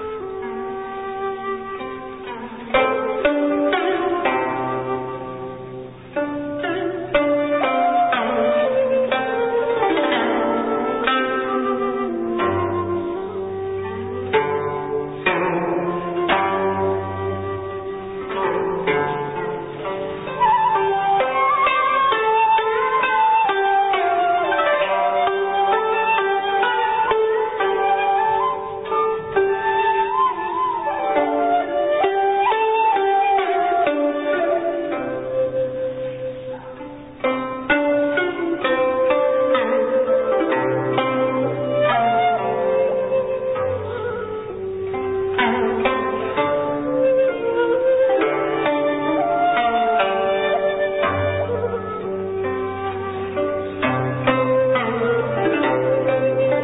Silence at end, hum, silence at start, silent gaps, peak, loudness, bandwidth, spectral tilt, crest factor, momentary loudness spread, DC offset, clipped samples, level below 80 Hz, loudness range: 0 s; none; 0 s; none; -6 dBFS; -20 LUFS; 4 kHz; -10.5 dB/octave; 14 dB; 10 LU; 0.2%; under 0.1%; -50 dBFS; 5 LU